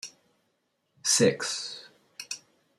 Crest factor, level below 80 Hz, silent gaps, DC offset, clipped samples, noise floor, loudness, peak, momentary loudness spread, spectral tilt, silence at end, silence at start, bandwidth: 20 dB; -74 dBFS; none; under 0.1%; under 0.1%; -76 dBFS; -27 LUFS; -10 dBFS; 22 LU; -2.5 dB/octave; 0.4 s; 0.05 s; 15 kHz